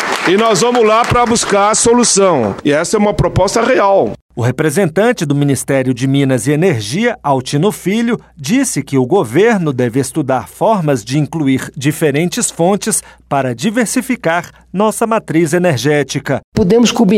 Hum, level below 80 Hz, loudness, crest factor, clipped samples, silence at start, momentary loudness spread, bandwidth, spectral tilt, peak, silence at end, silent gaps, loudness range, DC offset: none; -40 dBFS; -13 LUFS; 12 dB; under 0.1%; 0 s; 6 LU; 16 kHz; -4.5 dB/octave; -2 dBFS; 0 s; 4.22-4.29 s, 16.44-16.52 s; 4 LU; under 0.1%